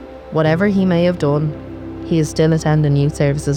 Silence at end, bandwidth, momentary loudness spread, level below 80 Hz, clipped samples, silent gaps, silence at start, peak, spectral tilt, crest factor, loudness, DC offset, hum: 0 s; 11 kHz; 9 LU; -38 dBFS; under 0.1%; none; 0 s; -4 dBFS; -7 dB/octave; 12 dB; -16 LUFS; under 0.1%; none